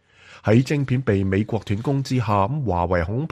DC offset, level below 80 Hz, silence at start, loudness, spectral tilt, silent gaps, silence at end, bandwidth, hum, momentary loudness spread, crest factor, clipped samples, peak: under 0.1%; -44 dBFS; 0.3 s; -22 LUFS; -7.5 dB/octave; none; 0.05 s; 12 kHz; none; 5 LU; 16 dB; under 0.1%; -6 dBFS